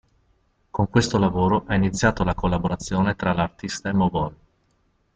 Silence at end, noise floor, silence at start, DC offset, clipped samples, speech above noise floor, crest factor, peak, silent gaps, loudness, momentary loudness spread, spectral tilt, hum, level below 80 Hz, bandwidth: 0.8 s; -66 dBFS; 0.75 s; under 0.1%; under 0.1%; 44 dB; 18 dB; -4 dBFS; none; -23 LUFS; 7 LU; -6 dB/octave; none; -40 dBFS; 9.2 kHz